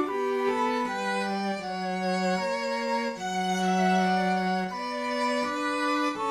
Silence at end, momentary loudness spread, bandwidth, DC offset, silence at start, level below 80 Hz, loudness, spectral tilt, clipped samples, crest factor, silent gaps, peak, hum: 0 s; 6 LU; 13 kHz; under 0.1%; 0 s; -70 dBFS; -28 LUFS; -5 dB/octave; under 0.1%; 14 dB; none; -14 dBFS; none